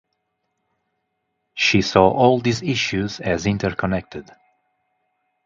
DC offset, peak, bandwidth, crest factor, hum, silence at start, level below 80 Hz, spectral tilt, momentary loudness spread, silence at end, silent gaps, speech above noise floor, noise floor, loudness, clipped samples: under 0.1%; 0 dBFS; 7.8 kHz; 22 dB; none; 1.55 s; -46 dBFS; -5 dB/octave; 13 LU; 1.25 s; none; 55 dB; -74 dBFS; -19 LUFS; under 0.1%